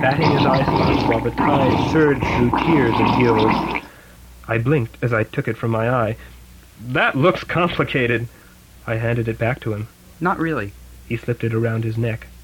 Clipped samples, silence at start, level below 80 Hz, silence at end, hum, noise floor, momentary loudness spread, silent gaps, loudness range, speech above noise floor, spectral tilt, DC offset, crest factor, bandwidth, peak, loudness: under 0.1%; 0 s; -40 dBFS; 0 s; none; -43 dBFS; 11 LU; none; 6 LU; 25 dB; -7.5 dB/octave; under 0.1%; 16 dB; 17 kHz; -4 dBFS; -19 LUFS